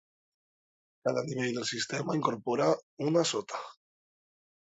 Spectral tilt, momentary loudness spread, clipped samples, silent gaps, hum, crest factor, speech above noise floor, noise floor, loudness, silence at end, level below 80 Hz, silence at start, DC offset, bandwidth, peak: -4.5 dB/octave; 8 LU; under 0.1%; 2.83-2.97 s; none; 20 dB; over 59 dB; under -90 dBFS; -31 LUFS; 1.05 s; -76 dBFS; 1.05 s; under 0.1%; 8.2 kHz; -12 dBFS